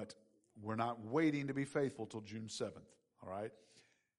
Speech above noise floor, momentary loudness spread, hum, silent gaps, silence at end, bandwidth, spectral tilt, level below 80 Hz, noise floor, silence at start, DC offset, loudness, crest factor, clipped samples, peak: 23 dB; 16 LU; none; none; 0.4 s; 11.5 kHz; -6 dB/octave; -82 dBFS; -64 dBFS; 0 s; under 0.1%; -41 LUFS; 18 dB; under 0.1%; -24 dBFS